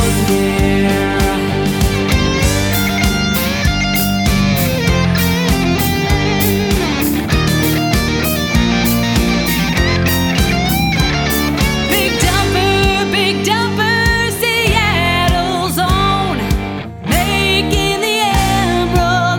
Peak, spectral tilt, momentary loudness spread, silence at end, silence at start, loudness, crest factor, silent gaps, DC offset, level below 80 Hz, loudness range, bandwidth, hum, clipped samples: 0 dBFS; -4.5 dB/octave; 3 LU; 0 s; 0 s; -14 LUFS; 14 dB; none; under 0.1%; -24 dBFS; 1 LU; over 20 kHz; none; under 0.1%